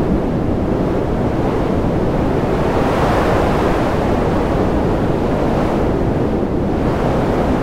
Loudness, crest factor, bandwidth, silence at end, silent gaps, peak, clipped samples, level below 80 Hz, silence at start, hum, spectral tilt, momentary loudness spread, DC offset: -17 LUFS; 14 dB; 16 kHz; 0 s; none; -2 dBFS; under 0.1%; -24 dBFS; 0 s; none; -8 dB/octave; 3 LU; under 0.1%